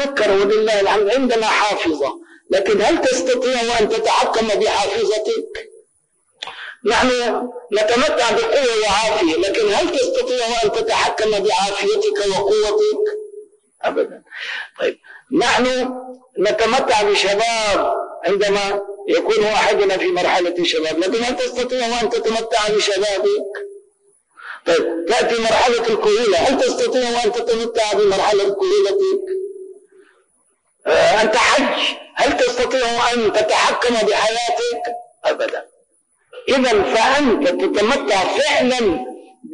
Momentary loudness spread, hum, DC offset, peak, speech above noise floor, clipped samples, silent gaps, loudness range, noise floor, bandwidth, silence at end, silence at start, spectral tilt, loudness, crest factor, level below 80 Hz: 9 LU; none; under 0.1%; -6 dBFS; 46 dB; under 0.1%; none; 3 LU; -63 dBFS; 10.5 kHz; 0 s; 0 s; -2.5 dB/octave; -17 LUFS; 12 dB; -48 dBFS